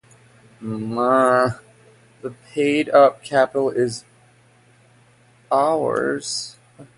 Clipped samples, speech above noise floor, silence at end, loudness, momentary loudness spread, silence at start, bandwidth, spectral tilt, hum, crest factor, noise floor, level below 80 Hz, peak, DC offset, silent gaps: under 0.1%; 35 dB; 0.15 s; -19 LUFS; 20 LU; 0.6 s; 11.5 kHz; -4.5 dB/octave; none; 20 dB; -54 dBFS; -62 dBFS; -2 dBFS; under 0.1%; none